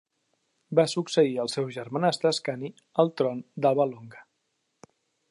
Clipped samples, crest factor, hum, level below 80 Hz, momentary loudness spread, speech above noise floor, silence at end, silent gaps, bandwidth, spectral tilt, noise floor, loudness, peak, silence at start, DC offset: under 0.1%; 20 dB; none; -80 dBFS; 8 LU; 51 dB; 1.1 s; none; 11.5 kHz; -5.5 dB/octave; -77 dBFS; -26 LUFS; -8 dBFS; 0.7 s; under 0.1%